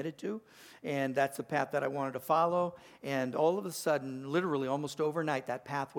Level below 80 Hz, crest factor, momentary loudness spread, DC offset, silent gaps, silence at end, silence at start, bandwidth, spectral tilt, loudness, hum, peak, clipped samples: -78 dBFS; 18 dB; 8 LU; under 0.1%; none; 0 s; 0 s; 19 kHz; -5.5 dB/octave; -33 LUFS; none; -16 dBFS; under 0.1%